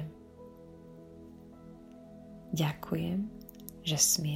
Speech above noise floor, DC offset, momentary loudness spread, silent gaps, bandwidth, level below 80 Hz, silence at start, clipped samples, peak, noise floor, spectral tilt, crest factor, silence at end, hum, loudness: 21 dB; under 0.1%; 25 LU; none; 16 kHz; -60 dBFS; 0 s; under 0.1%; -12 dBFS; -52 dBFS; -3.5 dB/octave; 24 dB; 0 s; none; -31 LUFS